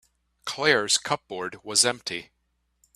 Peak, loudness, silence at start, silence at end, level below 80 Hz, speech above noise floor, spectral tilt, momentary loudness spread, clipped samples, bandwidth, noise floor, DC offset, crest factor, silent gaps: -4 dBFS; -24 LUFS; 0.45 s; 0.7 s; -66 dBFS; 44 dB; -1 dB/octave; 14 LU; under 0.1%; 15.5 kHz; -70 dBFS; under 0.1%; 24 dB; none